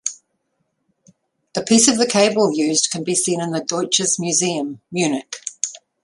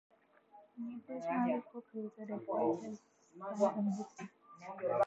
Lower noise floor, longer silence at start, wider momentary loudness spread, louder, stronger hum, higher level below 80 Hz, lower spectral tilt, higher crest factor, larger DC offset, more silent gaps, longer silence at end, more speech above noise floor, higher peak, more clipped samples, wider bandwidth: first, -71 dBFS vs -64 dBFS; second, 0.05 s vs 0.55 s; second, 12 LU vs 17 LU; first, -18 LUFS vs -39 LUFS; neither; first, -62 dBFS vs -86 dBFS; second, -3 dB/octave vs -7.5 dB/octave; about the same, 20 dB vs 20 dB; neither; neither; first, 0.25 s vs 0 s; first, 53 dB vs 26 dB; first, -2 dBFS vs -20 dBFS; neither; first, 11.5 kHz vs 8.2 kHz